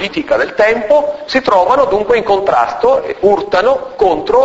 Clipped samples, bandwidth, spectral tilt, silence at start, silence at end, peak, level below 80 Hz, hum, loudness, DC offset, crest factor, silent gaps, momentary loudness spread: under 0.1%; 8 kHz; -5 dB/octave; 0 s; 0 s; 0 dBFS; -42 dBFS; none; -12 LUFS; under 0.1%; 12 dB; none; 4 LU